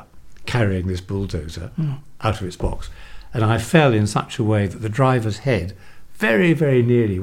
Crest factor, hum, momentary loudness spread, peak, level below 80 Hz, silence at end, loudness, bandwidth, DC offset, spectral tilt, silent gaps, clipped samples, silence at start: 18 dB; none; 13 LU; -2 dBFS; -38 dBFS; 0 s; -20 LUFS; 15.5 kHz; under 0.1%; -6.5 dB/octave; none; under 0.1%; 0 s